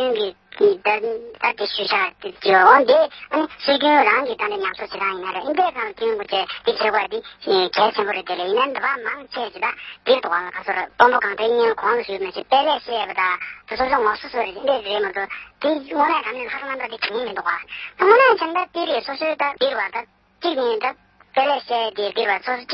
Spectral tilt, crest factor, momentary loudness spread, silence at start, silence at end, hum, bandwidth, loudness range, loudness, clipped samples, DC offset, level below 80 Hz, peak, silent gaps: -6 dB/octave; 20 dB; 11 LU; 0 s; 0 s; none; 6 kHz; 6 LU; -20 LUFS; under 0.1%; under 0.1%; -60 dBFS; 0 dBFS; none